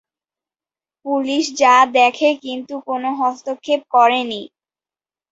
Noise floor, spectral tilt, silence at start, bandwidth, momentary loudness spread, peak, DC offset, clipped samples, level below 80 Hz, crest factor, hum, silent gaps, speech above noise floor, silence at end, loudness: under -90 dBFS; -2 dB/octave; 1.05 s; 8 kHz; 15 LU; -2 dBFS; under 0.1%; under 0.1%; -70 dBFS; 16 dB; none; none; over 73 dB; 0.85 s; -16 LUFS